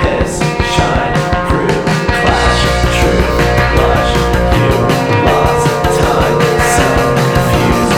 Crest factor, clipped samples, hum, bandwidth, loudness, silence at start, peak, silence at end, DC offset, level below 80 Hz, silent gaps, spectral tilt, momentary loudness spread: 10 dB; under 0.1%; none; 18 kHz; -11 LUFS; 0 s; 0 dBFS; 0 s; under 0.1%; -20 dBFS; none; -5 dB/octave; 3 LU